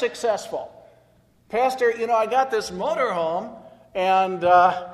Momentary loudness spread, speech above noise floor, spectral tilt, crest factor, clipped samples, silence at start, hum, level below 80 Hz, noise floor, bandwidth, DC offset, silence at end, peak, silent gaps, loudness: 16 LU; 37 dB; -4 dB/octave; 18 dB; under 0.1%; 0 s; none; -62 dBFS; -58 dBFS; 13 kHz; under 0.1%; 0 s; -4 dBFS; none; -22 LUFS